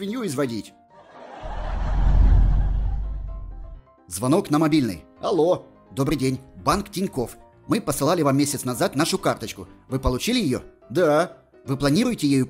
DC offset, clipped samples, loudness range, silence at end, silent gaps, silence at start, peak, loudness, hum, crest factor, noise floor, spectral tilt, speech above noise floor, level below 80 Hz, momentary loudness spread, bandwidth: under 0.1%; under 0.1%; 2 LU; 0 s; none; 0 s; -6 dBFS; -23 LUFS; none; 16 dB; -45 dBFS; -5.5 dB/octave; 23 dB; -28 dBFS; 15 LU; 16 kHz